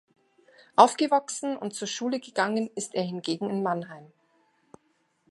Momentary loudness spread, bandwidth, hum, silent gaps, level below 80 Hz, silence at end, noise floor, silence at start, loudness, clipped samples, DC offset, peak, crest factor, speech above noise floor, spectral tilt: 12 LU; 11.5 kHz; none; none; -80 dBFS; 1.25 s; -71 dBFS; 0.8 s; -27 LUFS; under 0.1%; under 0.1%; -2 dBFS; 26 dB; 44 dB; -4 dB/octave